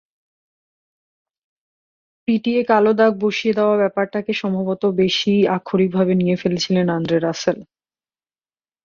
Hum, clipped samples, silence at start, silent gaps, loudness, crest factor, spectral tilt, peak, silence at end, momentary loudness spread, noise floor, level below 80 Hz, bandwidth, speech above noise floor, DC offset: none; under 0.1%; 2.3 s; none; -18 LUFS; 18 dB; -6 dB/octave; -2 dBFS; 1.2 s; 7 LU; under -90 dBFS; -60 dBFS; 7.2 kHz; over 72 dB; under 0.1%